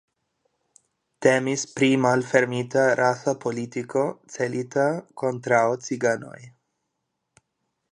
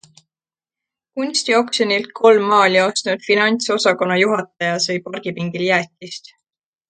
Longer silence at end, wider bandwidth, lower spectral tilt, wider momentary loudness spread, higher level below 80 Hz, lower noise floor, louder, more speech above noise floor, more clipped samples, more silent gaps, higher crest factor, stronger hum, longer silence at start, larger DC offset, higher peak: first, 1.4 s vs 0.7 s; first, 11 kHz vs 9.4 kHz; first, -5 dB/octave vs -3.5 dB/octave; second, 9 LU vs 14 LU; about the same, -70 dBFS vs -68 dBFS; second, -79 dBFS vs under -90 dBFS; second, -23 LUFS vs -17 LUFS; second, 56 dB vs over 73 dB; neither; neither; about the same, 22 dB vs 18 dB; neither; about the same, 1.2 s vs 1.15 s; neither; second, -4 dBFS vs 0 dBFS